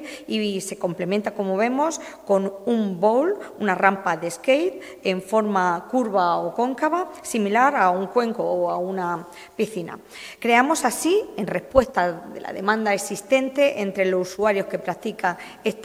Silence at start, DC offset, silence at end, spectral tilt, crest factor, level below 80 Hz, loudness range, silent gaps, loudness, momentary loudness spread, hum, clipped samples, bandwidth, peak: 0 s; under 0.1%; 0 s; -4.5 dB/octave; 22 dB; -54 dBFS; 2 LU; none; -22 LUFS; 9 LU; none; under 0.1%; 16 kHz; 0 dBFS